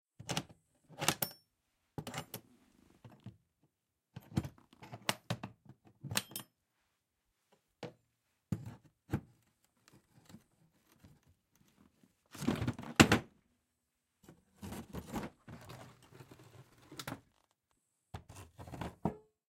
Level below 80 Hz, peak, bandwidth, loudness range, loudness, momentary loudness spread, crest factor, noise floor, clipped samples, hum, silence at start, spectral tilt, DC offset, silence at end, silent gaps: -64 dBFS; -8 dBFS; 16.5 kHz; 16 LU; -37 LUFS; 23 LU; 34 dB; -84 dBFS; under 0.1%; none; 0.2 s; -4 dB/octave; under 0.1%; 0.35 s; none